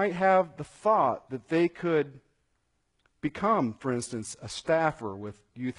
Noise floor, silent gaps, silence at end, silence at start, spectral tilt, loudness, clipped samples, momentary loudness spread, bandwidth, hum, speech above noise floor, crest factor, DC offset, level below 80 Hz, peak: -75 dBFS; none; 0.05 s; 0 s; -5.5 dB/octave; -28 LUFS; under 0.1%; 13 LU; 11 kHz; none; 47 dB; 18 dB; under 0.1%; -64 dBFS; -10 dBFS